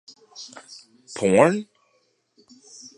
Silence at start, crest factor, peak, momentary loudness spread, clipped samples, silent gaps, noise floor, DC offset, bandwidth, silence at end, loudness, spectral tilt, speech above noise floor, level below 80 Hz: 0.4 s; 24 dB; -2 dBFS; 27 LU; under 0.1%; none; -67 dBFS; under 0.1%; 11.5 kHz; 1.35 s; -20 LUFS; -5.5 dB/octave; 45 dB; -64 dBFS